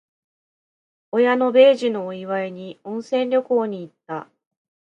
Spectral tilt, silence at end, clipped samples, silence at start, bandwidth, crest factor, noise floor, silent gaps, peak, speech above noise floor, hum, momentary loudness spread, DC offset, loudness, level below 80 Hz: -6 dB/octave; 0.7 s; under 0.1%; 1.15 s; 8.2 kHz; 18 dB; under -90 dBFS; none; -4 dBFS; over 70 dB; none; 19 LU; under 0.1%; -19 LUFS; -78 dBFS